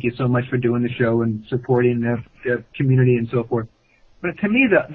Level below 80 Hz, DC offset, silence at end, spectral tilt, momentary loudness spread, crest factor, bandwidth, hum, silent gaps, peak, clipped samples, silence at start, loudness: -52 dBFS; under 0.1%; 0 s; -11 dB/octave; 10 LU; 16 dB; 4.3 kHz; none; none; -4 dBFS; under 0.1%; 0 s; -20 LUFS